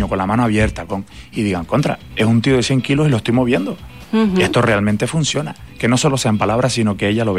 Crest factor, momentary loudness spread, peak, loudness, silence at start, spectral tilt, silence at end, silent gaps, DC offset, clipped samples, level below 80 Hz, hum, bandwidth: 12 dB; 9 LU; -4 dBFS; -17 LUFS; 0 s; -5.5 dB/octave; 0 s; none; 0.5%; under 0.1%; -38 dBFS; none; 15 kHz